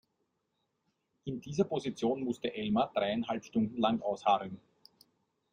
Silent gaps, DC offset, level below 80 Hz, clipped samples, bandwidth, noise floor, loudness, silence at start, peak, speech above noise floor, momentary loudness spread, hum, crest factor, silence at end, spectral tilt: none; under 0.1%; -68 dBFS; under 0.1%; 9.8 kHz; -81 dBFS; -33 LUFS; 1.25 s; -14 dBFS; 49 dB; 12 LU; none; 20 dB; 0.95 s; -6 dB/octave